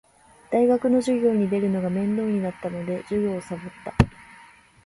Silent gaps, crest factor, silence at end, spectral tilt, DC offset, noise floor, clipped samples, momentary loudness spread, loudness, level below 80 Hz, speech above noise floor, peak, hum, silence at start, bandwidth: none; 24 dB; 0.55 s; -8 dB/octave; under 0.1%; -51 dBFS; under 0.1%; 11 LU; -24 LUFS; -42 dBFS; 28 dB; 0 dBFS; none; 0.5 s; 11.5 kHz